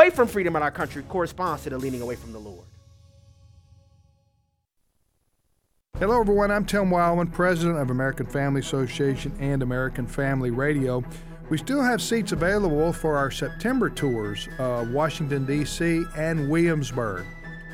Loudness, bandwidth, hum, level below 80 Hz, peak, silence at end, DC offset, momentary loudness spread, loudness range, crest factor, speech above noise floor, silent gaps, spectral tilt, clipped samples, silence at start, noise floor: -25 LUFS; 17 kHz; none; -40 dBFS; -2 dBFS; 0 s; under 0.1%; 9 LU; 9 LU; 24 dB; 48 dB; none; -6 dB/octave; under 0.1%; 0 s; -72 dBFS